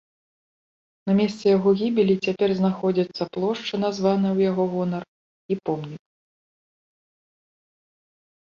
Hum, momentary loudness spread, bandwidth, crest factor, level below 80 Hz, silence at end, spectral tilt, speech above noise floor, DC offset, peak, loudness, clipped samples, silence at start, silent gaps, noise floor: none; 10 LU; 7.4 kHz; 16 dB; -66 dBFS; 2.45 s; -7.5 dB/octave; over 68 dB; under 0.1%; -8 dBFS; -23 LUFS; under 0.1%; 1.05 s; 5.08-5.49 s; under -90 dBFS